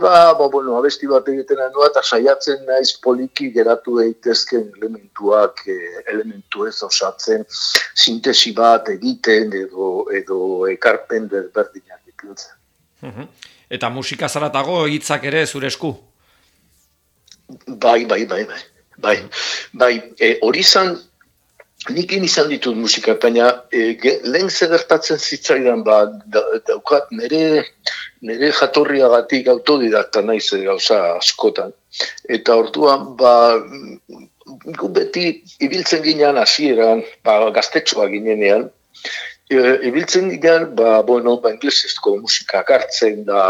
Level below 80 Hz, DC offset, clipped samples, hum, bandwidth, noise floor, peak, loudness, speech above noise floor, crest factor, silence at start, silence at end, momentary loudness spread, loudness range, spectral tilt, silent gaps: -66 dBFS; under 0.1%; under 0.1%; none; 16.5 kHz; -61 dBFS; 0 dBFS; -15 LUFS; 45 dB; 16 dB; 0 s; 0 s; 12 LU; 6 LU; -3 dB/octave; none